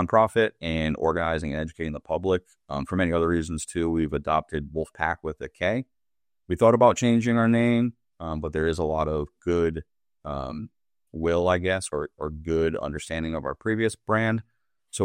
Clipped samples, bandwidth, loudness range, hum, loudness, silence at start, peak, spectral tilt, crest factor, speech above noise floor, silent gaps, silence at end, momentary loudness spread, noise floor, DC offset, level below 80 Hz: under 0.1%; 11 kHz; 5 LU; none; -26 LUFS; 0 s; -4 dBFS; -6 dB/octave; 20 dB; over 65 dB; none; 0 s; 13 LU; under -90 dBFS; under 0.1%; -46 dBFS